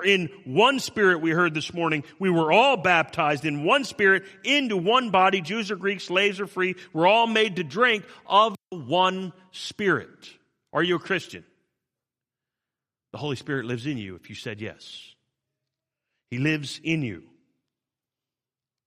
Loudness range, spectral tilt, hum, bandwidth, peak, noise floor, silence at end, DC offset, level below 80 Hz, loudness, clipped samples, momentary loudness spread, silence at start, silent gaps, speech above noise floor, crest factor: 13 LU; -4.5 dB/octave; none; 14.5 kHz; -4 dBFS; under -90 dBFS; 1.65 s; under 0.1%; -68 dBFS; -23 LUFS; under 0.1%; 16 LU; 0 s; none; over 66 dB; 22 dB